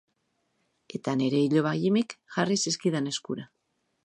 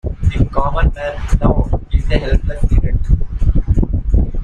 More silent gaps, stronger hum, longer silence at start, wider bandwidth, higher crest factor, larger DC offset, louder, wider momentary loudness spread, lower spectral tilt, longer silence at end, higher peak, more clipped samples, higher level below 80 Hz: neither; neither; first, 0.9 s vs 0.05 s; first, 11 kHz vs 7.4 kHz; first, 18 dB vs 12 dB; neither; second, -27 LUFS vs -18 LUFS; first, 12 LU vs 3 LU; second, -5 dB/octave vs -8 dB/octave; first, 0.6 s vs 0 s; second, -10 dBFS vs -2 dBFS; neither; second, -74 dBFS vs -16 dBFS